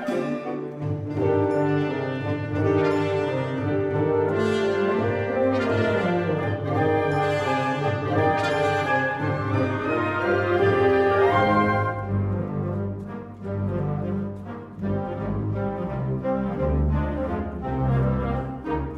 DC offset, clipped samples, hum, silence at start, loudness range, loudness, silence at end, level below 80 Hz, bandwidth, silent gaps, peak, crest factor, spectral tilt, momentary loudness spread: under 0.1%; under 0.1%; none; 0 s; 6 LU; -24 LUFS; 0 s; -40 dBFS; 11.5 kHz; none; -8 dBFS; 16 dB; -8 dB/octave; 9 LU